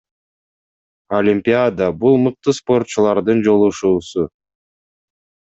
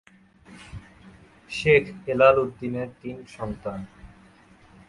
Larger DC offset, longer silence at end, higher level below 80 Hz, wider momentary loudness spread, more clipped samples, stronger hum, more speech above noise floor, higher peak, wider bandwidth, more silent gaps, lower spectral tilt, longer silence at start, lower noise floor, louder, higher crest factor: neither; first, 1.25 s vs 0.8 s; about the same, -56 dBFS vs -52 dBFS; second, 7 LU vs 25 LU; neither; neither; first, over 75 dB vs 30 dB; about the same, -2 dBFS vs -4 dBFS; second, 8 kHz vs 11.5 kHz; neither; about the same, -6.5 dB/octave vs -6 dB/octave; first, 1.1 s vs 0.5 s; first, under -90 dBFS vs -54 dBFS; first, -16 LUFS vs -23 LUFS; second, 16 dB vs 22 dB